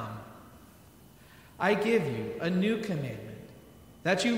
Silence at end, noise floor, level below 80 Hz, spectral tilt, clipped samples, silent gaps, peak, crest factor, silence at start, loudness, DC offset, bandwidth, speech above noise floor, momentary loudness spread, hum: 0 s; -55 dBFS; -64 dBFS; -5.5 dB/octave; under 0.1%; none; -12 dBFS; 20 dB; 0 s; -30 LUFS; under 0.1%; 16 kHz; 27 dB; 21 LU; none